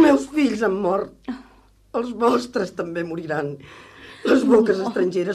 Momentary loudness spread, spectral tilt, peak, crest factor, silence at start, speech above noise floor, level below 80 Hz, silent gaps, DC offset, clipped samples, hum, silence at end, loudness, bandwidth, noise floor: 18 LU; -6 dB/octave; -6 dBFS; 16 dB; 0 s; 32 dB; -56 dBFS; none; under 0.1%; under 0.1%; none; 0 s; -21 LUFS; 13 kHz; -53 dBFS